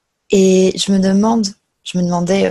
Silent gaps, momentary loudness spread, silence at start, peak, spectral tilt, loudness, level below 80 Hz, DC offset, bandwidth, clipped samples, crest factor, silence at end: none; 11 LU; 0.3 s; 0 dBFS; -5.5 dB/octave; -14 LUFS; -48 dBFS; under 0.1%; 12 kHz; under 0.1%; 14 dB; 0 s